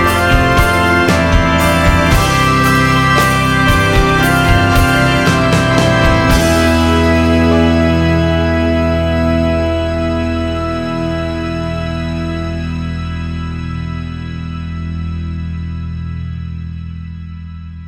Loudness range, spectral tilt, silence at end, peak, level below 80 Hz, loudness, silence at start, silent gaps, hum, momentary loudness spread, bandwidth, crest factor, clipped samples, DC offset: 12 LU; -5.5 dB/octave; 0 s; 0 dBFS; -22 dBFS; -13 LUFS; 0 s; none; none; 13 LU; 18 kHz; 12 dB; under 0.1%; under 0.1%